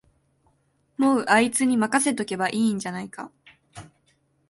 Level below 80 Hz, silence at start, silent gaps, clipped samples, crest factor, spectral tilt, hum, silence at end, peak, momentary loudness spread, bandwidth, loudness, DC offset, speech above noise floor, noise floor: -66 dBFS; 1 s; none; under 0.1%; 20 dB; -3.5 dB/octave; none; 0.65 s; -6 dBFS; 19 LU; 12 kHz; -22 LUFS; under 0.1%; 44 dB; -67 dBFS